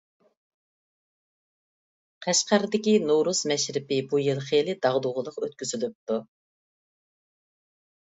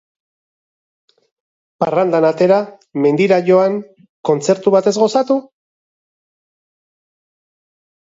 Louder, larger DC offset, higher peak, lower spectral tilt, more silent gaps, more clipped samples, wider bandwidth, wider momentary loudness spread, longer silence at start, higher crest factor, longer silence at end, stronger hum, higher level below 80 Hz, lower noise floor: second, -25 LUFS vs -15 LUFS; neither; second, -8 dBFS vs 0 dBFS; second, -3.5 dB/octave vs -6 dB/octave; about the same, 5.95-6.07 s vs 4.09-4.24 s; neither; about the same, 8 kHz vs 7.8 kHz; about the same, 10 LU vs 8 LU; first, 2.2 s vs 1.8 s; about the same, 20 dB vs 18 dB; second, 1.85 s vs 2.6 s; neither; second, -76 dBFS vs -68 dBFS; about the same, under -90 dBFS vs under -90 dBFS